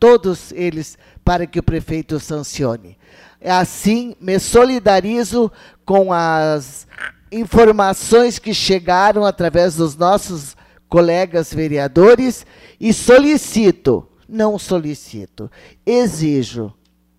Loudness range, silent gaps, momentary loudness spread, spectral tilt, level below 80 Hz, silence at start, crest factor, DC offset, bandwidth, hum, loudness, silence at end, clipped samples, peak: 6 LU; none; 18 LU; -5 dB/octave; -38 dBFS; 0 s; 12 dB; under 0.1%; 15 kHz; none; -15 LUFS; 0.45 s; under 0.1%; -2 dBFS